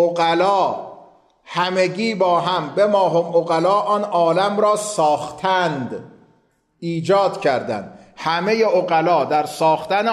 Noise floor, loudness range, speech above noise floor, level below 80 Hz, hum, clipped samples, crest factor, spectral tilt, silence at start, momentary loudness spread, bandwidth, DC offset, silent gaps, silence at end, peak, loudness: -61 dBFS; 4 LU; 43 dB; -66 dBFS; none; under 0.1%; 12 dB; -5 dB/octave; 0 s; 11 LU; 13.5 kHz; under 0.1%; none; 0 s; -6 dBFS; -18 LUFS